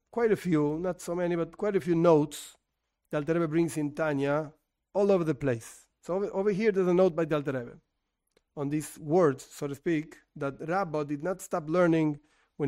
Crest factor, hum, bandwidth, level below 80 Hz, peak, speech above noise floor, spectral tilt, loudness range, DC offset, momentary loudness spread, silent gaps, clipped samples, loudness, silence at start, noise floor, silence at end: 18 dB; none; 16 kHz; -62 dBFS; -10 dBFS; 53 dB; -7 dB/octave; 3 LU; under 0.1%; 12 LU; none; under 0.1%; -29 LUFS; 0.15 s; -81 dBFS; 0 s